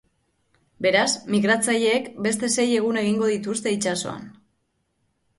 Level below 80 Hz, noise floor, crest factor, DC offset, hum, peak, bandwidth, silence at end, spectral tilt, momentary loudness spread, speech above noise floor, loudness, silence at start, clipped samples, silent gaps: -64 dBFS; -72 dBFS; 18 dB; under 0.1%; none; -6 dBFS; 12 kHz; 1.05 s; -3.5 dB/octave; 6 LU; 50 dB; -22 LUFS; 0.8 s; under 0.1%; none